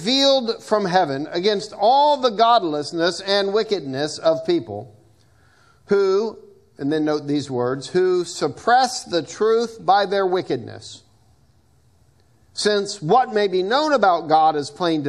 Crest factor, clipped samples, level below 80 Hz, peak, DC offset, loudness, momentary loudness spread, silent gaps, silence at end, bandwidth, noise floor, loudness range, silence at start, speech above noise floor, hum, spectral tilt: 18 dB; under 0.1%; -64 dBFS; -2 dBFS; under 0.1%; -20 LUFS; 9 LU; none; 0 s; 12 kHz; -58 dBFS; 5 LU; 0 s; 39 dB; none; -4.5 dB/octave